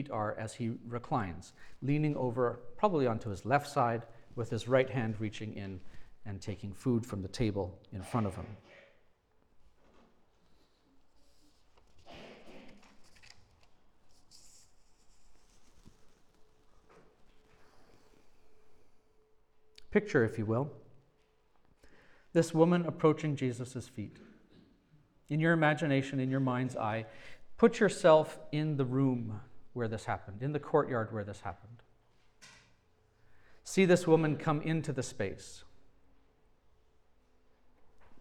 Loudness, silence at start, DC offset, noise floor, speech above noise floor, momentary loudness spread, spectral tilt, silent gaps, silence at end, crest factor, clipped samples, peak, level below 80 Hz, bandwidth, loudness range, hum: -32 LUFS; 0 s; under 0.1%; -69 dBFS; 37 dB; 19 LU; -6.5 dB/octave; none; 0 s; 24 dB; under 0.1%; -12 dBFS; -62 dBFS; 13.5 kHz; 9 LU; none